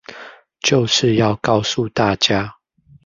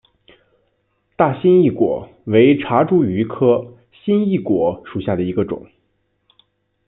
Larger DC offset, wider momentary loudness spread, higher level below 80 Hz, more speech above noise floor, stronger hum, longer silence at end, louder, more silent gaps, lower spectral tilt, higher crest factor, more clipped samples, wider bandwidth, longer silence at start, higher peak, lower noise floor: neither; about the same, 13 LU vs 12 LU; first, -48 dBFS vs -54 dBFS; second, 23 dB vs 51 dB; neither; second, 0.55 s vs 1.25 s; about the same, -17 LUFS vs -17 LUFS; neither; second, -4.5 dB/octave vs -12 dB/octave; about the same, 18 dB vs 16 dB; neither; first, 7.6 kHz vs 4 kHz; second, 0.1 s vs 1.2 s; about the same, 0 dBFS vs -2 dBFS; second, -40 dBFS vs -66 dBFS